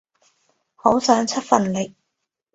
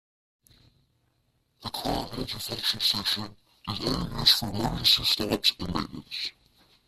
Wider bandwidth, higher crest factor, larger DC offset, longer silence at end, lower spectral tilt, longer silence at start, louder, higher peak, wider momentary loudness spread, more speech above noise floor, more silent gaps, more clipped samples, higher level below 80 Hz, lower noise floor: second, 8.2 kHz vs 15.5 kHz; about the same, 22 dB vs 24 dB; neither; about the same, 0.65 s vs 0.55 s; first, -4.5 dB/octave vs -3 dB/octave; second, 0.85 s vs 1.6 s; first, -20 LUFS vs -26 LUFS; first, 0 dBFS vs -6 dBFS; second, 9 LU vs 15 LU; first, 60 dB vs 43 dB; neither; neither; second, -58 dBFS vs -48 dBFS; first, -79 dBFS vs -71 dBFS